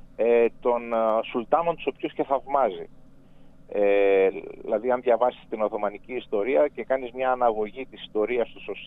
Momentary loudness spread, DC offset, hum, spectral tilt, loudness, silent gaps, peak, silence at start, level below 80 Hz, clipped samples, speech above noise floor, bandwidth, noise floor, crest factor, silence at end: 11 LU; under 0.1%; none; -7.5 dB/octave; -25 LUFS; none; -8 dBFS; 0.05 s; -56 dBFS; under 0.1%; 24 dB; 3.9 kHz; -48 dBFS; 18 dB; 0 s